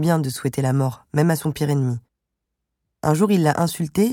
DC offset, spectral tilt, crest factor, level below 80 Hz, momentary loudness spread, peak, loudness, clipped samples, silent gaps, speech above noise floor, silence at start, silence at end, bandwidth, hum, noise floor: under 0.1%; -6.5 dB/octave; 18 dB; -54 dBFS; 7 LU; -4 dBFS; -21 LUFS; under 0.1%; none; 60 dB; 0 s; 0 s; 17.5 kHz; none; -80 dBFS